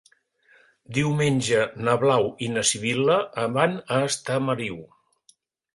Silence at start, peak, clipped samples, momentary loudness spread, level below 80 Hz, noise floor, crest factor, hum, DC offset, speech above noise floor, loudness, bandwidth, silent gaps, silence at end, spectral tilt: 0.9 s; -6 dBFS; under 0.1%; 6 LU; -60 dBFS; -62 dBFS; 20 dB; none; under 0.1%; 39 dB; -23 LUFS; 11.5 kHz; none; 0.9 s; -4.5 dB/octave